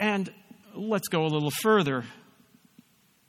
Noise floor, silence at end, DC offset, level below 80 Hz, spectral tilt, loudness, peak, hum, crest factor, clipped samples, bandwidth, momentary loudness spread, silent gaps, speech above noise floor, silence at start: -60 dBFS; 1.15 s; under 0.1%; -72 dBFS; -5 dB/octave; -27 LUFS; -10 dBFS; none; 18 dB; under 0.1%; 16.5 kHz; 16 LU; none; 34 dB; 0 s